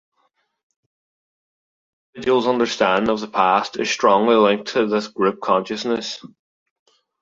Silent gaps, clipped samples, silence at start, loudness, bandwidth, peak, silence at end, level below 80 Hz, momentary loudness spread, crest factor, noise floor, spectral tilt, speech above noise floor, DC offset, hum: none; under 0.1%; 2.15 s; -19 LUFS; 7.8 kHz; -2 dBFS; 0.95 s; -62 dBFS; 8 LU; 20 dB; -68 dBFS; -4.5 dB/octave; 49 dB; under 0.1%; none